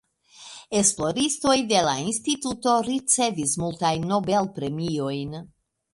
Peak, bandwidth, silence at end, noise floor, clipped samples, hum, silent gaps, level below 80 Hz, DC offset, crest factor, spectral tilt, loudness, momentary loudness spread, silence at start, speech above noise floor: -6 dBFS; 11.5 kHz; 0.45 s; -48 dBFS; under 0.1%; none; none; -56 dBFS; under 0.1%; 20 dB; -3.5 dB/octave; -23 LUFS; 9 LU; 0.4 s; 24 dB